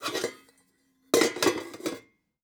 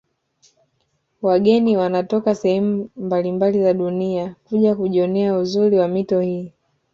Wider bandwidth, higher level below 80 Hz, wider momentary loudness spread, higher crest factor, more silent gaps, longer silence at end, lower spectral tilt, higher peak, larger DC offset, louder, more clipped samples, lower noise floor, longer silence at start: first, over 20 kHz vs 7.4 kHz; second, -72 dBFS vs -62 dBFS; first, 12 LU vs 8 LU; first, 24 dB vs 16 dB; neither; about the same, 0.45 s vs 0.45 s; second, -2.5 dB/octave vs -8 dB/octave; second, -8 dBFS vs -4 dBFS; neither; second, -28 LUFS vs -19 LUFS; neither; about the same, -68 dBFS vs -68 dBFS; second, 0 s vs 1.2 s